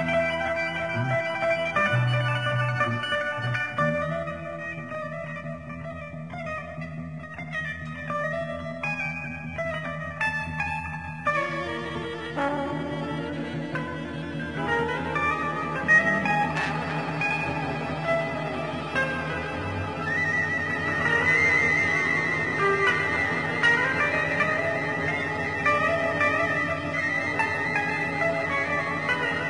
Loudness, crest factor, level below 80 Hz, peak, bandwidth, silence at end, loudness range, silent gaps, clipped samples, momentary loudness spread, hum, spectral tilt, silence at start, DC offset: -25 LUFS; 18 dB; -52 dBFS; -10 dBFS; 10 kHz; 0 s; 9 LU; none; under 0.1%; 12 LU; none; -5.5 dB/octave; 0 s; 0.2%